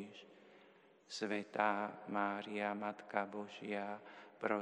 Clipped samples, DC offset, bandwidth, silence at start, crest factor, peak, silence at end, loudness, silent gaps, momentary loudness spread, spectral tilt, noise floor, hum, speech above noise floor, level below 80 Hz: under 0.1%; under 0.1%; 10.5 kHz; 0 s; 24 dB; -20 dBFS; 0 s; -41 LUFS; none; 15 LU; -5 dB/octave; -66 dBFS; none; 25 dB; under -90 dBFS